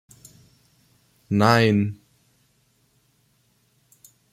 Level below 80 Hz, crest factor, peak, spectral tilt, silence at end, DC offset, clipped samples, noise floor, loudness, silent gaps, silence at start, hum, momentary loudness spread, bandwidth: -62 dBFS; 22 dB; -4 dBFS; -6.5 dB/octave; 2.4 s; under 0.1%; under 0.1%; -65 dBFS; -20 LUFS; none; 1.3 s; none; 14 LU; 15.5 kHz